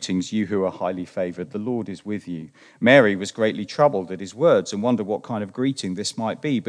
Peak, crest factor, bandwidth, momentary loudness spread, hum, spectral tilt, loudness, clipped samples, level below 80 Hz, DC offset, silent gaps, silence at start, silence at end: 0 dBFS; 22 dB; 10.5 kHz; 14 LU; none; -5.5 dB/octave; -22 LUFS; under 0.1%; -68 dBFS; under 0.1%; none; 0 s; 0 s